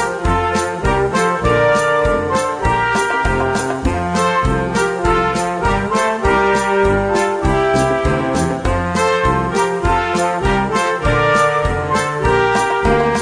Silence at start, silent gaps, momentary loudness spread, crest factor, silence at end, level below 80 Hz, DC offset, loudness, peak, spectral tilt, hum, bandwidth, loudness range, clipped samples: 0 s; none; 4 LU; 14 dB; 0 s; -28 dBFS; under 0.1%; -16 LUFS; -2 dBFS; -5 dB/octave; none; 10.5 kHz; 1 LU; under 0.1%